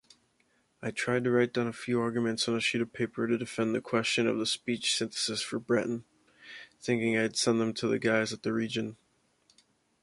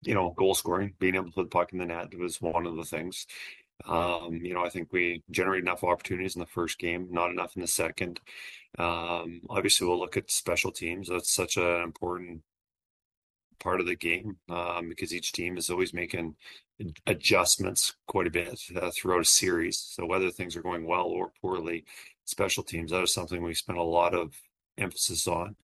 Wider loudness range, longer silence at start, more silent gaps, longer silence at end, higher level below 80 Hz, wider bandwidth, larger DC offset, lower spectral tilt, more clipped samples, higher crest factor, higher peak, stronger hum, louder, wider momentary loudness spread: second, 1 LU vs 6 LU; first, 0.8 s vs 0 s; second, none vs 12.86-13.11 s, 13.17-13.34 s, 13.44-13.50 s; first, 1.1 s vs 0.1 s; second, -70 dBFS vs -58 dBFS; second, 11.5 kHz vs 13 kHz; neither; first, -4 dB/octave vs -2.5 dB/octave; neither; about the same, 20 dB vs 22 dB; second, -12 dBFS vs -8 dBFS; neither; about the same, -30 LUFS vs -29 LUFS; second, 9 LU vs 13 LU